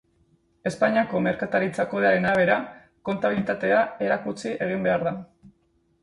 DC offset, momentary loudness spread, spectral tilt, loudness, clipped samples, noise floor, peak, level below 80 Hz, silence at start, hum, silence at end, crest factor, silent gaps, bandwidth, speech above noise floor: under 0.1%; 11 LU; -6.5 dB/octave; -24 LUFS; under 0.1%; -66 dBFS; -6 dBFS; -60 dBFS; 0.65 s; none; 0.55 s; 18 dB; none; 11.5 kHz; 43 dB